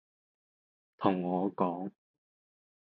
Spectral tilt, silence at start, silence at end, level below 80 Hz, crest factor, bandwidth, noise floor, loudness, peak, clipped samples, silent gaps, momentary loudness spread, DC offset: -10.5 dB/octave; 1 s; 1 s; -78 dBFS; 24 dB; 4.7 kHz; under -90 dBFS; -33 LUFS; -12 dBFS; under 0.1%; none; 10 LU; under 0.1%